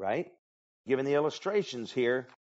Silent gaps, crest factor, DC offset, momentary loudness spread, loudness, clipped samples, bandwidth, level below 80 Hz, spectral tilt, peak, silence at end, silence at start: 0.39-0.84 s; 16 dB; under 0.1%; 8 LU; -31 LUFS; under 0.1%; 8 kHz; -80 dBFS; -4 dB/octave; -16 dBFS; 0.25 s; 0 s